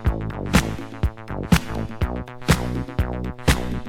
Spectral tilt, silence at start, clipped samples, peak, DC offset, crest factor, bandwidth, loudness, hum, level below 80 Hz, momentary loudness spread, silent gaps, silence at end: -5.5 dB/octave; 0 s; under 0.1%; -2 dBFS; under 0.1%; 20 dB; 17 kHz; -24 LUFS; none; -28 dBFS; 8 LU; none; 0 s